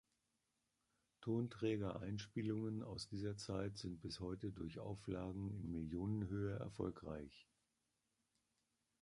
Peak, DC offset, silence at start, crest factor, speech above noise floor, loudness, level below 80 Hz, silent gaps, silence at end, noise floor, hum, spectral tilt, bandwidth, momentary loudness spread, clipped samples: -28 dBFS; under 0.1%; 1.2 s; 18 dB; 42 dB; -46 LUFS; -64 dBFS; none; 1.6 s; -88 dBFS; none; -7 dB/octave; 11 kHz; 7 LU; under 0.1%